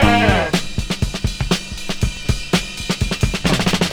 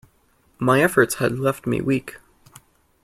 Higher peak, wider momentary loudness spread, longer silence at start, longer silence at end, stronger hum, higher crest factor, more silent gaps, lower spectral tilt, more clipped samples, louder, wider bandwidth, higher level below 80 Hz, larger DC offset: about the same, 0 dBFS vs -2 dBFS; about the same, 8 LU vs 9 LU; second, 0 s vs 0.6 s; second, 0 s vs 0.85 s; neither; about the same, 18 dB vs 20 dB; neither; about the same, -4.5 dB/octave vs -5.5 dB/octave; neither; about the same, -19 LUFS vs -20 LUFS; first, over 20 kHz vs 16 kHz; first, -26 dBFS vs -54 dBFS; neither